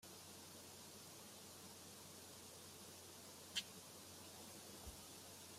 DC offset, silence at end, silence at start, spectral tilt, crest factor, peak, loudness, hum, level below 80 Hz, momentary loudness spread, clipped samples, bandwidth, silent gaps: under 0.1%; 0 s; 0 s; -2 dB/octave; 28 dB; -30 dBFS; -55 LUFS; none; -76 dBFS; 9 LU; under 0.1%; 16 kHz; none